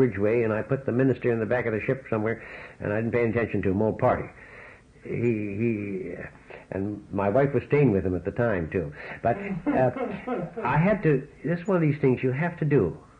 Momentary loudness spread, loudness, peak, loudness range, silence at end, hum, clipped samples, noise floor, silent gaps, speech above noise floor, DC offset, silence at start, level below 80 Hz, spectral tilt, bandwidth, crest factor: 12 LU; -26 LUFS; -10 dBFS; 3 LU; 0.2 s; none; under 0.1%; -48 dBFS; none; 23 dB; under 0.1%; 0 s; -54 dBFS; -10 dB/octave; 7.4 kHz; 16 dB